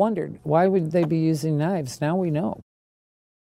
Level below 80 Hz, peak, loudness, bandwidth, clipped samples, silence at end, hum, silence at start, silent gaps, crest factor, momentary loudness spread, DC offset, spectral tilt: -60 dBFS; -6 dBFS; -23 LUFS; 15 kHz; under 0.1%; 0.85 s; none; 0 s; none; 18 dB; 8 LU; under 0.1%; -7.5 dB/octave